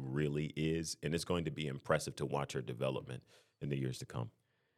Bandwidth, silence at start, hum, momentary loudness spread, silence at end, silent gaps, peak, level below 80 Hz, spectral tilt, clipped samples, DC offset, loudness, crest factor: 14.5 kHz; 0 s; none; 9 LU; 0.5 s; none; -16 dBFS; -64 dBFS; -5.5 dB/octave; under 0.1%; under 0.1%; -39 LUFS; 22 dB